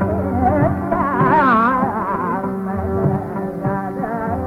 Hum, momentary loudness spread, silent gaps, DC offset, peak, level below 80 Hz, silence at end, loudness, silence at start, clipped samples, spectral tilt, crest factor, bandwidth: none; 9 LU; none; under 0.1%; -2 dBFS; -40 dBFS; 0 s; -18 LUFS; 0 s; under 0.1%; -9.5 dB/octave; 14 dB; 13 kHz